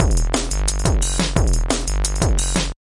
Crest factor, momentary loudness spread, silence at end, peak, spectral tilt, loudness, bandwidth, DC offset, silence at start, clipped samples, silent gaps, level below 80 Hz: 18 dB; 3 LU; 0.2 s; 0 dBFS; -4 dB/octave; -20 LUFS; 11.5 kHz; under 0.1%; 0 s; under 0.1%; none; -20 dBFS